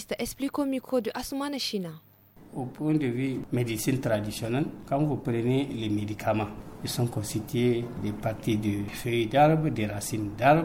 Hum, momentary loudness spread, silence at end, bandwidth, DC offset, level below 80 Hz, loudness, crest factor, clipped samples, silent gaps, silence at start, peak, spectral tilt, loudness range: none; 8 LU; 0 s; 17 kHz; under 0.1%; -52 dBFS; -29 LUFS; 20 dB; under 0.1%; none; 0 s; -8 dBFS; -6 dB/octave; 4 LU